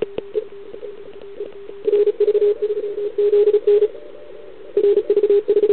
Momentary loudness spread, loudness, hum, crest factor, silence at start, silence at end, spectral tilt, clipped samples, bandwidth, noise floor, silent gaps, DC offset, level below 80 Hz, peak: 22 LU; -18 LUFS; none; 12 dB; 0 s; 0 s; -10 dB/octave; under 0.1%; 4.2 kHz; -39 dBFS; none; 1%; -62 dBFS; -6 dBFS